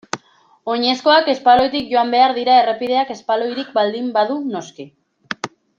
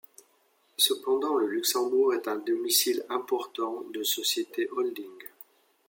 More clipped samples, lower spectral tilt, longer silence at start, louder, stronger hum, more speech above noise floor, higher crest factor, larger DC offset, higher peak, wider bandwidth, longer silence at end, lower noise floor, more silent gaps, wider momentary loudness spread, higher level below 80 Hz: neither; first, -3.5 dB/octave vs -0.5 dB/octave; second, 0.15 s vs 0.8 s; first, -16 LUFS vs -27 LUFS; neither; about the same, 36 dB vs 39 dB; about the same, 16 dB vs 20 dB; neither; first, -2 dBFS vs -10 dBFS; second, 7.6 kHz vs 17 kHz; second, 0.3 s vs 0.6 s; second, -53 dBFS vs -67 dBFS; neither; first, 16 LU vs 11 LU; first, -58 dBFS vs -86 dBFS